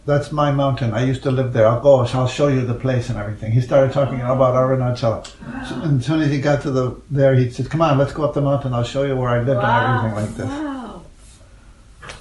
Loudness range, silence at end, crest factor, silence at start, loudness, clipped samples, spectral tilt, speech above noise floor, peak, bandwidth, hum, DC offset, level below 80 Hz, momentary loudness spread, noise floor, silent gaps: 3 LU; 0 s; 18 dB; 0.05 s; -18 LUFS; under 0.1%; -7.5 dB/octave; 27 dB; -2 dBFS; 11 kHz; none; under 0.1%; -42 dBFS; 10 LU; -44 dBFS; none